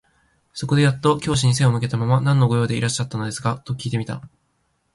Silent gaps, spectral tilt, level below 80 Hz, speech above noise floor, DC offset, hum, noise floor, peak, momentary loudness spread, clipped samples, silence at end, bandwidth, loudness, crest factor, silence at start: none; -5.5 dB/octave; -50 dBFS; 48 dB; under 0.1%; none; -68 dBFS; -6 dBFS; 11 LU; under 0.1%; 0.65 s; 11.5 kHz; -20 LUFS; 16 dB; 0.55 s